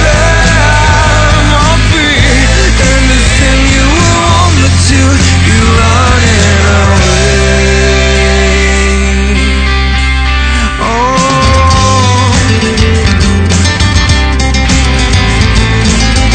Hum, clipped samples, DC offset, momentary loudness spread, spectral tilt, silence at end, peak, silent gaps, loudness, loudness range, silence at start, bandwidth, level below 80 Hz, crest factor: none; 1%; under 0.1%; 3 LU; -4.5 dB/octave; 0 s; 0 dBFS; none; -7 LUFS; 2 LU; 0 s; 10 kHz; -12 dBFS; 6 dB